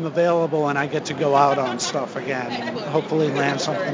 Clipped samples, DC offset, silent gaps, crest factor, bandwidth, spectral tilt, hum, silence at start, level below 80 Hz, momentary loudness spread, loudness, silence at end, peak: under 0.1%; under 0.1%; none; 18 dB; 7.6 kHz; -5 dB/octave; none; 0 s; -66 dBFS; 9 LU; -22 LUFS; 0 s; -4 dBFS